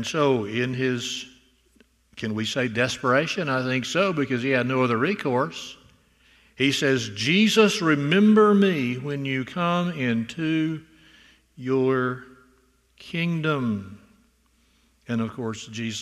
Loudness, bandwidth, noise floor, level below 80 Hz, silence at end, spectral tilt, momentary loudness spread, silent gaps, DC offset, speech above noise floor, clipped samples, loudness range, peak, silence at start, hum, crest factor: -23 LUFS; 13.5 kHz; -63 dBFS; -64 dBFS; 0 s; -5 dB/octave; 14 LU; none; under 0.1%; 40 dB; under 0.1%; 8 LU; -6 dBFS; 0 s; none; 20 dB